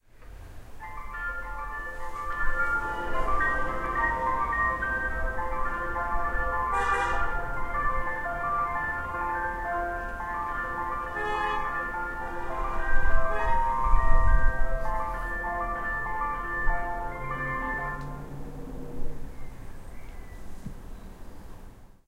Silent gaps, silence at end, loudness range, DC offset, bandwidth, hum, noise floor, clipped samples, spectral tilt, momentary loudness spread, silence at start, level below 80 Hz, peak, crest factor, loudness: none; 0.2 s; 8 LU; under 0.1%; 8.2 kHz; none; -47 dBFS; under 0.1%; -6 dB/octave; 19 LU; 0.2 s; -32 dBFS; -6 dBFS; 20 dB; -30 LUFS